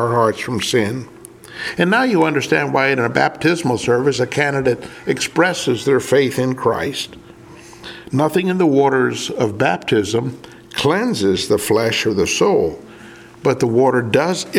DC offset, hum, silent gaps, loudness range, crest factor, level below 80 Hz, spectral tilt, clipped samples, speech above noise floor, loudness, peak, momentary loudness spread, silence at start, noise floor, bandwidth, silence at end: under 0.1%; none; none; 2 LU; 18 dB; -52 dBFS; -5 dB/octave; under 0.1%; 23 dB; -17 LUFS; 0 dBFS; 10 LU; 0 s; -40 dBFS; 16.5 kHz; 0 s